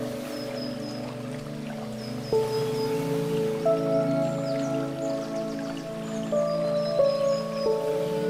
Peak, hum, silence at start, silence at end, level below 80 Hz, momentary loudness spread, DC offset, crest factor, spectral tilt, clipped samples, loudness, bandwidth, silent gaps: -12 dBFS; none; 0 s; 0 s; -60 dBFS; 10 LU; under 0.1%; 16 dB; -6 dB/octave; under 0.1%; -28 LUFS; 16 kHz; none